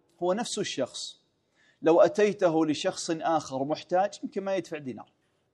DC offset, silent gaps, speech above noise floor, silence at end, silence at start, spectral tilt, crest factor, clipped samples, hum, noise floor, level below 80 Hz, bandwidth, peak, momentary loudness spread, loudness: under 0.1%; none; 41 dB; 0.5 s; 0.2 s; -4.5 dB/octave; 18 dB; under 0.1%; none; -68 dBFS; -78 dBFS; 11.5 kHz; -10 dBFS; 16 LU; -28 LUFS